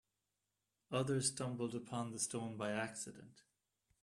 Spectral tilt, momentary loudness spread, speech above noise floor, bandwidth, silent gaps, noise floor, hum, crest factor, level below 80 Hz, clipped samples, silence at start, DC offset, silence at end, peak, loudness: -4 dB/octave; 9 LU; 47 dB; 13.5 kHz; none; -89 dBFS; none; 20 dB; -78 dBFS; under 0.1%; 0.9 s; under 0.1%; 0.65 s; -22 dBFS; -41 LUFS